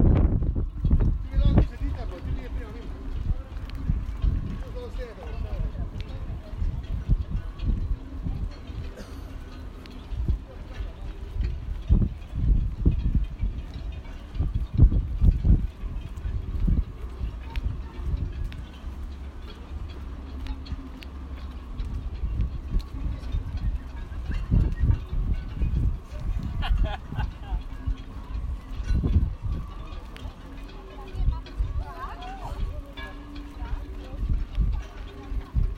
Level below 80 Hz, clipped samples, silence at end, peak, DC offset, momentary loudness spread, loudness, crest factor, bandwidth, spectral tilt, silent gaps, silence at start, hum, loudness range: -28 dBFS; under 0.1%; 0 s; -6 dBFS; under 0.1%; 15 LU; -31 LUFS; 22 dB; 6.2 kHz; -8.5 dB/octave; none; 0 s; none; 9 LU